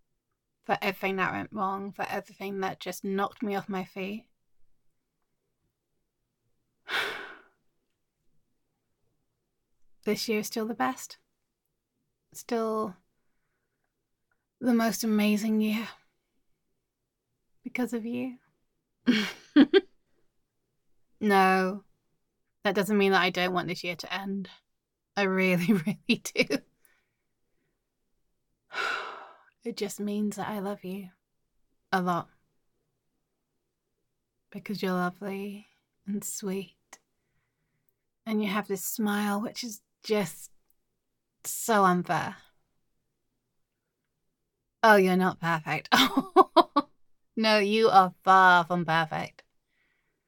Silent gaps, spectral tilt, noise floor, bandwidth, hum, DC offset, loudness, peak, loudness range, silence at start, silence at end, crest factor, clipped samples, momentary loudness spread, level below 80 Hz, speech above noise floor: none; -4.5 dB/octave; -82 dBFS; 17.5 kHz; none; under 0.1%; -27 LUFS; -4 dBFS; 15 LU; 0.7 s; 1 s; 24 dB; under 0.1%; 18 LU; -72 dBFS; 56 dB